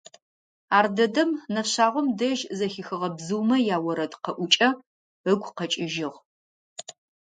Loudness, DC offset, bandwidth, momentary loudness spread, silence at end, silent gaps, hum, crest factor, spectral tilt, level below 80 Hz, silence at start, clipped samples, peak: -25 LUFS; under 0.1%; 9.4 kHz; 15 LU; 0.3 s; 4.87-5.24 s, 6.25-6.76 s; none; 22 dB; -3.5 dB/octave; -76 dBFS; 0.7 s; under 0.1%; -4 dBFS